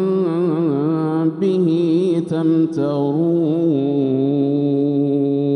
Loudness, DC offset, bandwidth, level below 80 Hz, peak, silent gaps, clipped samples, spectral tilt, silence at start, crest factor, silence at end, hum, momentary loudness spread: -18 LUFS; under 0.1%; 9.4 kHz; -68 dBFS; -8 dBFS; none; under 0.1%; -9.5 dB/octave; 0 s; 10 dB; 0 s; none; 2 LU